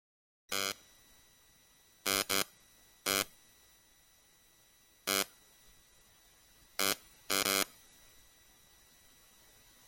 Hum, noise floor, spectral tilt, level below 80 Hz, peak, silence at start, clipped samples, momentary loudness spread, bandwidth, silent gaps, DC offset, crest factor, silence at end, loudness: none; -65 dBFS; -0.5 dB/octave; -72 dBFS; -10 dBFS; 0.5 s; under 0.1%; 10 LU; 17 kHz; none; under 0.1%; 30 dB; 2.2 s; -34 LUFS